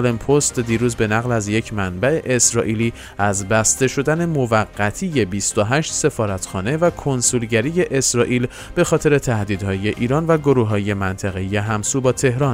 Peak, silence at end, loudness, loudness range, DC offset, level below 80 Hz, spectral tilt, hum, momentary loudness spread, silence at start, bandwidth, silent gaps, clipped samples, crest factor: -2 dBFS; 0 s; -18 LUFS; 1 LU; under 0.1%; -42 dBFS; -4.5 dB/octave; none; 6 LU; 0 s; 16 kHz; none; under 0.1%; 16 dB